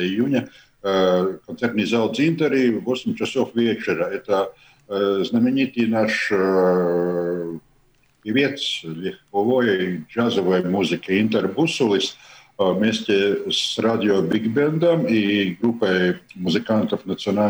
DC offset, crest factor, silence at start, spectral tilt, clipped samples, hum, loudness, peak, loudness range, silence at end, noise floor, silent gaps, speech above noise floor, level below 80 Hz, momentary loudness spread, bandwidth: under 0.1%; 16 dB; 0 s; -5.5 dB/octave; under 0.1%; none; -21 LUFS; -4 dBFS; 3 LU; 0 s; -59 dBFS; none; 39 dB; -62 dBFS; 7 LU; over 20 kHz